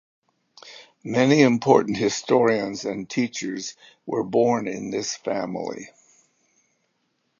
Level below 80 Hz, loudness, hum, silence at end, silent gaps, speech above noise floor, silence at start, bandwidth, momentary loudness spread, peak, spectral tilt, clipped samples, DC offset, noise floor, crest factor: -66 dBFS; -22 LUFS; none; 1.55 s; none; 50 dB; 0.65 s; 7.6 kHz; 22 LU; -2 dBFS; -5 dB/octave; under 0.1%; under 0.1%; -72 dBFS; 22 dB